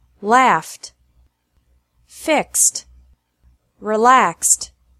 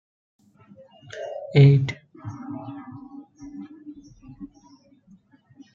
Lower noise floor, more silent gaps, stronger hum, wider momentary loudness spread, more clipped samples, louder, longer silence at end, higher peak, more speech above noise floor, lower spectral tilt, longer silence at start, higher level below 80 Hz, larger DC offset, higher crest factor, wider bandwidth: first, -61 dBFS vs -56 dBFS; neither; neither; second, 18 LU vs 28 LU; neither; first, -15 LUFS vs -21 LUFS; second, 0.35 s vs 1.3 s; first, 0 dBFS vs -4 dBFS; first, 45 dB vs 36 dB; second, -1.5 dB/octave vs -8.5 dB/octave; second, 0.2 s vs 1.15 s; first, -56 dBFS vs -62 dBFS; neither; about the same, 20 dB vs 22 dB; first, 15.5 kHz vs 6.8 kHz